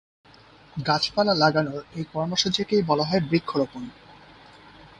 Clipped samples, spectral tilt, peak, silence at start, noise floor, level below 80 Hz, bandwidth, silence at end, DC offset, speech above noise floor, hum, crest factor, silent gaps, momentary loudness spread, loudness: under 0.1%; -5 dB/octave; -6 dBFS; 0.75 s; -51 dBFS; -58 dBFS; 10.5 kHz; 0.15 s; under 0.1%; 28 dB; none; 20 dB; none; 13 LU; -24 LUFS